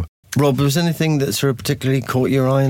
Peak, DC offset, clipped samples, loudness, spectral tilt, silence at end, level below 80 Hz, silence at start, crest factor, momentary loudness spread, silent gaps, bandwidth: -6 dBFS; under 0.1%; under 0.1%; -18 LUFS; -6 dB/octave; 0 s; -46 dBFS; 0 s; 12 dB; 3 LU; 0.08-0.23 s; 17 kHz